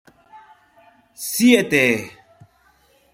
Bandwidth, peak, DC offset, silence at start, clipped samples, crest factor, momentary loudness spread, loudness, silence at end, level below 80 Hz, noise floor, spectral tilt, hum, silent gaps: 16.5 kHz; 0 dBFS; under 0.1%; 0.35 s; under 0.1%; 22 dB; 16 LU; -17 LUFS; 1.05 s; -62 dBFS; -58 dBFS; -3.5 dB/octave; none; none